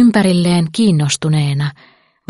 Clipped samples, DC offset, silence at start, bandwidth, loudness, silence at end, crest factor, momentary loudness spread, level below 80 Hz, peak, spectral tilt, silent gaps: under 0.1%; under 0.1%; 0 s; 11.5 kHz; -14 LUFS; 0.6 s; 12 dB; 7 LU; -50 dBFS; 0 dBFS; -5.5 dB/octave; none